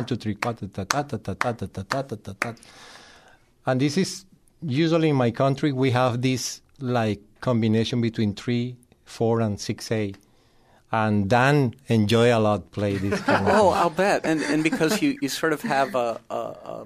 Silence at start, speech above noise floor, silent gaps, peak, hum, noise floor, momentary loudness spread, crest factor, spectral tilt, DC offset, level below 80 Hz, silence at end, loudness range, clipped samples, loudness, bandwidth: 0 s; 35 dB; none; 0 dBFS; none; -58 dBFS; 12 LU; 24 dB; -5.5 dB/octave; under 0.1%; -58 dBFS; 0 s; 8 LU; under 0.1%; -24 LUFS; 15.5 kHz